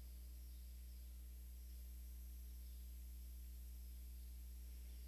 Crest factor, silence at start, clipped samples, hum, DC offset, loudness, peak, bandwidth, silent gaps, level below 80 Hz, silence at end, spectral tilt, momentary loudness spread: 6 dB; 0 s; under 0.1%; 60 Hz at -55 dBFS; under 0.1%; -57 LUFS; -46 dBFS; 13.5 kHz; none; -54 dBFS; 0 s; -4.5 dB/octave; 1 LU